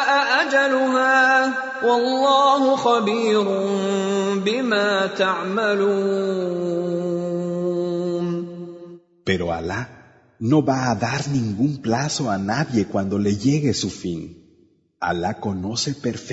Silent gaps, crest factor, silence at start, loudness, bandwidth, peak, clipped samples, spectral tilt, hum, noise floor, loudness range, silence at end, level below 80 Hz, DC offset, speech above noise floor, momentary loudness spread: none; 16 dB; 0 s; -21 LUFS; 8 kHz; -4 dBFS; under 0.1%; -5 dB/octave; none; -58 dBFS; 7 LU; 0 s; -56 dBFS; under 0.1%; 38 dB; 11 LU